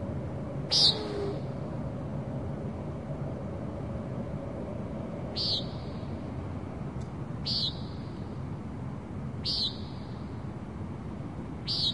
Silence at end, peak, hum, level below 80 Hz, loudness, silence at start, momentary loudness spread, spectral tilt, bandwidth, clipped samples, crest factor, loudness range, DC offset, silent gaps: 0 s; -12 dBFS; none; -50 dBFS; -33 LUFS; 0 s; 10 LU; -5 dB/octave; 11.5 kHz; under 0.1%; 22 dB; 7 LU; 0.2%; none